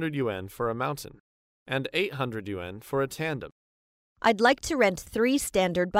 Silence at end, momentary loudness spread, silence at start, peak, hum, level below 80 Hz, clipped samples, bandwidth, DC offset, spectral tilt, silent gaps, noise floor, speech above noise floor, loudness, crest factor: 0 s; 13 LU; 0 s; -8 dBFS; none; -54 dBFS; under 0.1%; 16 kHz; under 0.1%; -4.5 dB/octave; 1.20-1.66 s, 3.52-4.16 s; under -90 dBFS; over 63 dB; -28 LUFS; 20 dB